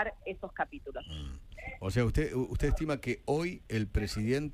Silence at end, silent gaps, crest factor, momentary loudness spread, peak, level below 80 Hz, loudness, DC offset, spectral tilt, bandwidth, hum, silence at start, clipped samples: 0 s; none; 18 dB; 13 LU; -16 dBFS; -40 dBFS; -34 LUFS; under 0.1%; -6.5 dB/octave; 15.5 kHz; none; 0 s; under 0.1%